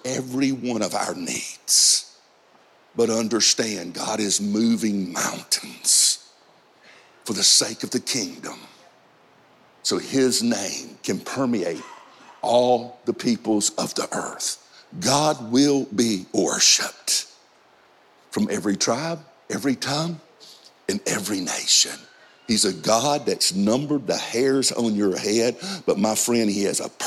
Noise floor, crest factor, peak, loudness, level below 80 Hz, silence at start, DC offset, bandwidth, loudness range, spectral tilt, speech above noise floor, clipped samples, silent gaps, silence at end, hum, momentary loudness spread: -56 dBFS; 18 dB; -4 dBFS; -21 LUFS; -70 dBFS; 0.05 s; under 0.1%; 16 kHz; 5 LU; -2.5 dB/octave; 34 dB; under 0.1%; none; 0 s; none; 13 LU